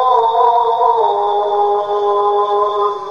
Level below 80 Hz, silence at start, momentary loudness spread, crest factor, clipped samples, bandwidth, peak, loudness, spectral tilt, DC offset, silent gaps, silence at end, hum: -64 dBFS; 0 s; 4 LU; 12 dB; under 0.1%; 6.8 kHz; -2 dBFS; -14 LUFS; -4.5 dB/octave; under 0.1%; none; 0 s; none